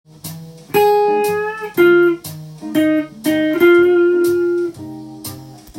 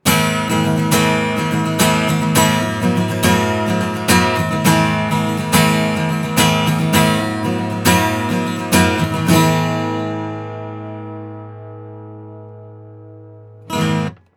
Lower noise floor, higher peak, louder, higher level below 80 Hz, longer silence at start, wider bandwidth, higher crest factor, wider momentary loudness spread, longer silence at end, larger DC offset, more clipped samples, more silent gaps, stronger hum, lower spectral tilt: second, -34 dBFS vs -39 dBFS; about the same, -2 dBFS vs 0 dBFS; about the same, -15 LUFS vs -16 LUFS; second, -56 dBFS vs -44 dBFS; first, 0.25 s vs 0.05 s; second, 16.5 kHz vs over 20 kHz; about the same, 14 dB vs 16 dB; first, 20 LU vs 17 LU; second, 0 s vs 0.2 s; neither; neither; neither; neither; about the same, -5.5 dB/octave vs -4.5 dB/octave